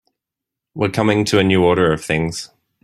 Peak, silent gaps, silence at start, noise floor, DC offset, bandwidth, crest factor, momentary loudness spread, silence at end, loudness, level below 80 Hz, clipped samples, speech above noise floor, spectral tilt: -2 dBFS; none; 0.75 s; -84 dBFS; under 0.1%; 15 kHz; 16 dB; 16 LU; 0.4 s; -17 LUFS; -48 dBFS; under 0.1%; 68 dB; -5.5 dB/octave